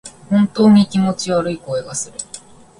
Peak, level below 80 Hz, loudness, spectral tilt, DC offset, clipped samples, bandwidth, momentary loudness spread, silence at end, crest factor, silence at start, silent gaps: 0 dBFS; -52 dBFS; -16 LUFS; -6 dB/octave; under 0.1%; under 0.1%; 11.5 kHz; 18 LU; 0.4 s; 16 dB; 0.05 s; none